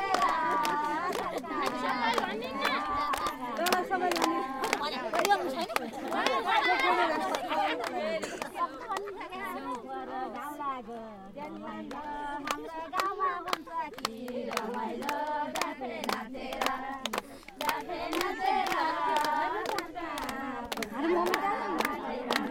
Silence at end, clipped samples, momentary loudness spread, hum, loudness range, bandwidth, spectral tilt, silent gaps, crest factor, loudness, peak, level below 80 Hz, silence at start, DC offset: 0 s; under 0.1%; 10 LU; none; 8 LU; 17 kHz; -2.5 dB/octave; none; 24 dB; -32 LUFS; -6 dBFS; -60 dBFS; 0 s; under 0.1%